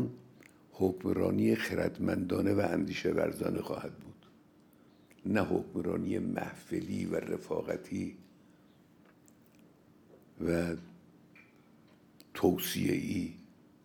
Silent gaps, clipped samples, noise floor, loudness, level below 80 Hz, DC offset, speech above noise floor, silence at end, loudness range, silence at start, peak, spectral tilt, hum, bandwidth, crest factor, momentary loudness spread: none; under 0.1%; -62 dBFS; -34 LUFS; -68 dBFS; under 0.1%; 29 dB; 0.4 s; 9 LU; 0 s; -14 dBFS; -6 dB/octave; none; over 20 kHz; 20 dB; 13 LU